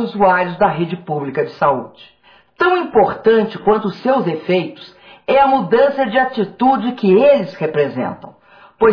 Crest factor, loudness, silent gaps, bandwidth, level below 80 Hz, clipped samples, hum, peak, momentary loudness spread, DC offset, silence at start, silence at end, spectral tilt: 14 dB; -15 LUFS; none; 5.4 kHz; -52 dBFS; under 0.1%; none; -2 dBFS; 10 LU; under 0.1%; 0 s; 0 s; -8.5 dB/octave